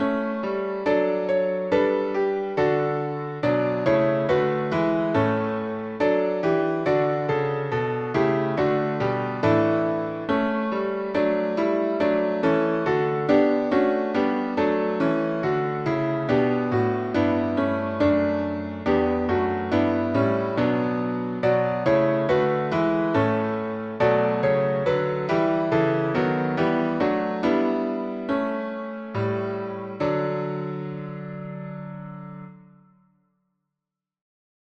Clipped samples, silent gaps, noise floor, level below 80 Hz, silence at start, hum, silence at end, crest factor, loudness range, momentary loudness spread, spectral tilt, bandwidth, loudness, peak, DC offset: under 0.1%; none; -87 dBFS; -54 dBFS; 0 s; none; 2.1 s; 16 dB; 6 LU; 7 LU; -8.5 dB/octave; 7.6 kHz; -23 LUFS; -8 dBFS; under 0.1%